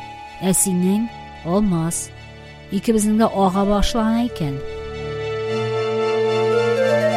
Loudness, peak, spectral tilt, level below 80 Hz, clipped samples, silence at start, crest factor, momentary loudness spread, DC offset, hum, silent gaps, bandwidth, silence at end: -20 LUFS; -4 dBFS; -5 dB/octave; -36 dBFS; under 0.1%; 0 s; 16 dB; 13 LU; under 0.1%; none; none; 16 kHz; 0 s